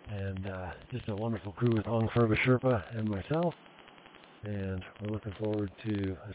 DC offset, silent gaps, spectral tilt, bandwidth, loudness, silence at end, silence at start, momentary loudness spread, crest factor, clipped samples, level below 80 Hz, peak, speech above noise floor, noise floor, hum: under 0.1%; none; -6.5 dB/octave; 4 kHz; -33 LUFS; 0 s; 0.05 s; 13 LU; 16 dB; under 0.1%; -52 dBFS; -16 dBFS; 23 dB; -55 dBFS; none